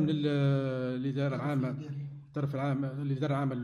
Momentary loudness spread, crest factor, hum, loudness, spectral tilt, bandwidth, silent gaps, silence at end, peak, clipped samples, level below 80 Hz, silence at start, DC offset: 10 LU; 12 dB; none; -32 LUFS; -9 dB/octave; 6.6 kHz; none; 0 s; -18 dBFS; under 0.1%; -68 dBFS; 0 s; under 0.1%